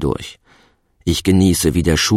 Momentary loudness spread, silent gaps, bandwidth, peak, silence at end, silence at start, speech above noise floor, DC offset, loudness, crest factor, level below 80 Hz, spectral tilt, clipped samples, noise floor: 13 LU; none; 16.5 kHz; -2 dBFS; 0 s; 0 s; 39 dB; under 0.1%; -16 LUFS; 14 dB; -32 dBFS; -5 dB/octave; under 0.1%; -55 dBFS